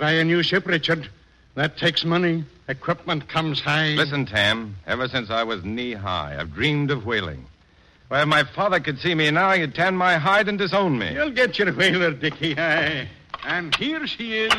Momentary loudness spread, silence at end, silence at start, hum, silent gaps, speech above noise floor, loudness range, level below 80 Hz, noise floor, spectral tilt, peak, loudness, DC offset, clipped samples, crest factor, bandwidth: 9 LU; 0 s; 0 s; none; none; 33 dB; 4 LU; -52 dBFS; -55 dBFS; -5.5 dB/octave; -8 dBFS; -21 LUFS; under 0.1%; under 0.1%; 16 dB; 12.5 kHz